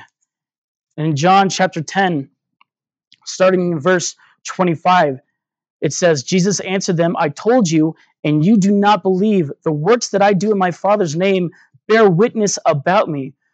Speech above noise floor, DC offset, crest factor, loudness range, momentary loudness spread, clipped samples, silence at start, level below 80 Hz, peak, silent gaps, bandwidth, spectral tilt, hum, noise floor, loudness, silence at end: 58 dB; under 0.1%; 16 dB; 3 LU; 11 LU; under 0.1%; 0.95 s; -72 dBFS; 0 dBFS; 3.07-3.11 s, 5.70-5.80 s, 8.19-8.23 s; 9 kHz; -5 dB/octave; none; -73 dBFS; -15 LUFS; 0.25 s